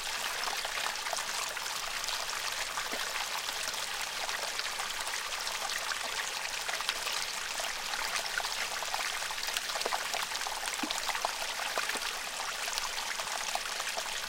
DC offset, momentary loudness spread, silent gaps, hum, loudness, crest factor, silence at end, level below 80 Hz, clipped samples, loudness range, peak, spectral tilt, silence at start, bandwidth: under 0.1%; 2 LU; none; none; -33 LUFS; 26 dB; 0 s; -58 dBFS; under 0.1%; 1 LU; -8 dBFS; 1 dB/octave; 0 s; 17 kHz